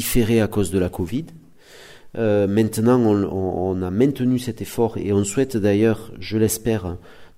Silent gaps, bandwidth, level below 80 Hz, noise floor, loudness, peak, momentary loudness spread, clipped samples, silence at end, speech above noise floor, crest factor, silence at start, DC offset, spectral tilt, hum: none; 16 kHz; -42 dBFS; -45 dBFS; -21 LUFS; -4 dBFS; 10 LU; under 0.1%; 0.1 s; 25 dB; 16 dB; 0 s; under 0.1%; -6 dB/octave; none